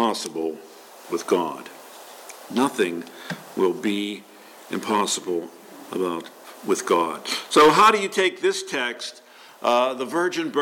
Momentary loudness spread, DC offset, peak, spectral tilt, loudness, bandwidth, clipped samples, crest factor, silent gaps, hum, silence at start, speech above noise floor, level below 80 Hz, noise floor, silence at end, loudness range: 24 LU; under 0.1%; -6 dBFS; -3 dB/octave; -22 LUFS; 17.5 kHz; under 0.1%; 18 dB; none; none; 0 s; 20 dB; -68 dBFS; -43 dBFS; 0 s; 7 LU